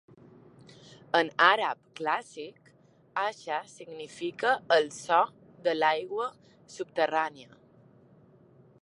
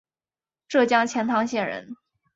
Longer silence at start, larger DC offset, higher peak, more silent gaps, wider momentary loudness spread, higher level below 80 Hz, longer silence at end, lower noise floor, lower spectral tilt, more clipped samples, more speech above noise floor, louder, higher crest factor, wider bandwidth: first, 1.15 s vs 0.7 s; neither; about the same, -6 dBFS vs -4 dBFS; neither; first, 20 LU vs 14 LU; second, -80 dBFS vs -70 dBFS; first, 1.4 s vs 0.4 s; second, -61 dBFS vs under -90 dBFS; about the same, -3 dB/octave vs -4 dB/octave; neither; second, 32 dB vs over 67 dB; second, -28 LUFS vs -23 LUFS; about the same, 24 dB vs 20 dB; first, 11.5 kHz vs 8 kHz